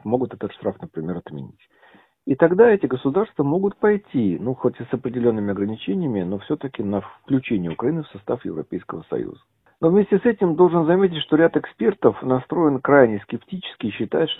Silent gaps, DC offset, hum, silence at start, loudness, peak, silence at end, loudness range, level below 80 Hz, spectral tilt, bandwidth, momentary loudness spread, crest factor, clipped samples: none; under 0.1%; none; 0.05 s; -21 LUFS; 0 dBFS; 0.05 s; 7 LU; -56 dBFS; -10.5 dB/octave; 4 kHz; 14 LU; 20 dB; under 0.1%